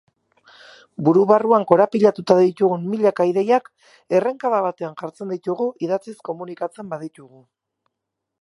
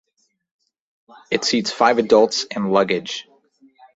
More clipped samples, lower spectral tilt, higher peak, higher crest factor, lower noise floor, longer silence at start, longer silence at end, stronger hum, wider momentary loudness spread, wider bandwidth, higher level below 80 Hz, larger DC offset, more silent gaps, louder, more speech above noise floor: neither; first, -7.5 dB/octave vs -3.5 dB/octave; about the same, 0 dBFS vs -2 dBFS; about the same, 20 dB vs 20 dB; first, -81 dBFS vs -55 dBFS; second, 1 s vs 1.3 s; first, 1.2 s vs 0.75 s; neither; first, 16 LU vs 10 LU; first, 11.5 kHz vs 8 kHz; second, -72 dBFS vs -64 dBFS; neither; neither; about the same, -19 LUFS vs -18 LUFS; first, 62 dB vs 37 dB